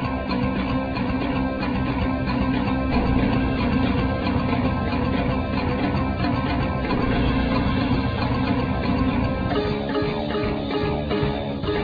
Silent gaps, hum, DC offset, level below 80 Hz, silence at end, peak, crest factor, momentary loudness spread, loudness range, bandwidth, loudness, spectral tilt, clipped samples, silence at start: none; none; under 0.1%; -32 dBFS; 0 s; -8 dBFS; 14 dB; 3 LU; 1 LU; 5 kHz; -23 LUFS; -9 dB/octave; under 0.1%; 0 s